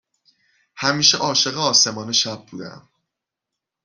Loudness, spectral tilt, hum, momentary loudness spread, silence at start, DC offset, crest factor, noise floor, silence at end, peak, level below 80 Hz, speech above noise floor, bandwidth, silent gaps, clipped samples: -17 LUFS; -1.5 dB/octave; none; 20 LU; 0.75 s; under 0.1%; 22 dB; -84 dBFS; 1.05 s; -2 dBFS; -64 dBFS; 64 dB; 12 kHz; none; under 0.1%